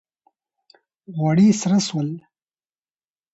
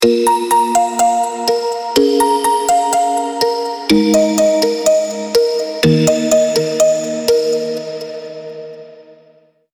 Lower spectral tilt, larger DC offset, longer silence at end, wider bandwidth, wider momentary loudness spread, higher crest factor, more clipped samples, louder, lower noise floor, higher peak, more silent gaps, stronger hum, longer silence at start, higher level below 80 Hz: first, -6 dB/octave vs -4 dB/octave; neither; first, 1.15 s vs 0.7 s; second, 8.2 kHz vs over 20 kHz; first, 17 LU vs 12 LU; about the same, 16 dB vs 14 dB; neither; second, -19 LUFS vs -14 LUFS; first, under -90 dBFS vs -51 dBFS; second, -6 dBFS vs 0 dBFS; neither; neither; first, 1.1 s vs 0 s; second, -64 dBFS vs -52 dBFS